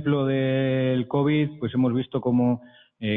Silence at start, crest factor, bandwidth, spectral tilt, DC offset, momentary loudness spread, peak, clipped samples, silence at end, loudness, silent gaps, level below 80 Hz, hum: 0 s; 12 dB; 3.9 kHz; -10.5 dB/octave; under 0.1%; 4 LU; -12 dBFS; under 0.1%; 0 s; -24 LUFS; none; -60 dBFS; none